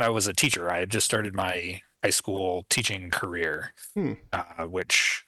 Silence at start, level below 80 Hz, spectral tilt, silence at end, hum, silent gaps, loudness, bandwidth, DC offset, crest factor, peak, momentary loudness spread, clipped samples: 0 s; -60 dBFS; -2.5 dB/octave; 0.05 s; none; none; -27 LUFS; over 20 kHz; under 0.1%; 20 dB; -8 dBFS; 10 LU; under 0.1%